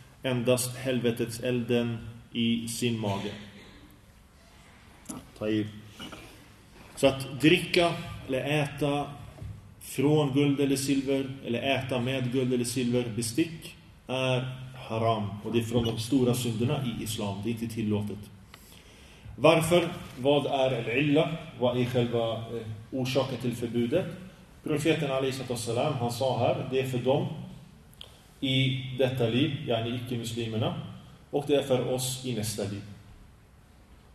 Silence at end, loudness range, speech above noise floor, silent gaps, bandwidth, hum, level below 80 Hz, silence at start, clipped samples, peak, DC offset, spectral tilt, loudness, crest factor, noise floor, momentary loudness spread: 0.2 s; 5 LU; 28 dB; none; 13.5 kHz; none; -56 dBFS; 0 s; under 0.1%; -6 dBFS; under 0.1%; -5.5 dB/octave; -28 LUFS; 24 dB; -55 dBFS; 18 LU